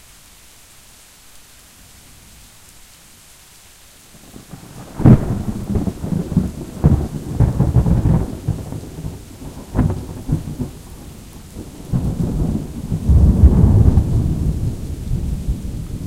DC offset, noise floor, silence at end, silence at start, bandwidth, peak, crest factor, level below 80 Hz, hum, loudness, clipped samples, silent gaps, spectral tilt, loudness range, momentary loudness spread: under 0.1%; -44 dBFS; 0 s; 1.35 s; 15.5 kHz; 0 dBFS; 18 dB; -24 dBFS; none; -18 LUFS; under 0.1%; none; -8.5 dB/octave; 9 LU; 23 LU